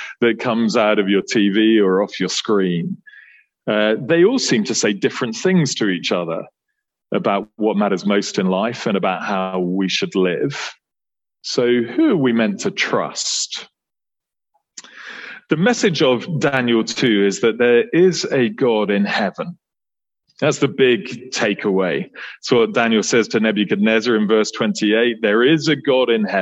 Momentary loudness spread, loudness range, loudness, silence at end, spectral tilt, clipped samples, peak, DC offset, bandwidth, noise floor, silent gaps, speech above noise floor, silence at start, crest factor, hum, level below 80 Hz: 9 LU; 4 LU; -17 LUFS; 0 s; -4.5 dB/octave; under 0.1%; -2 dBFS; under 0.1%; 8.4 kHz; under -90 dBFS; none; over 73 dB; 0 s; 16 dB; none; -64 dBFS